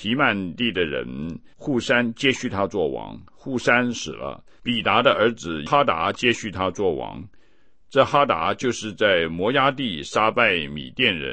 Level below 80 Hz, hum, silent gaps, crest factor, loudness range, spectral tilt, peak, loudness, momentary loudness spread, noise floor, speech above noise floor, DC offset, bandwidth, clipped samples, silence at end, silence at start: -52 dBFS; none; none; 20 dB; 3 LU; -4.5 dB/octave; -2 dBFS; -22 LUFS; 13 LU; -61 dBFS; 38 dB; 0.4%; 8.8 kHz; under 0.1%; 0 s; 0 s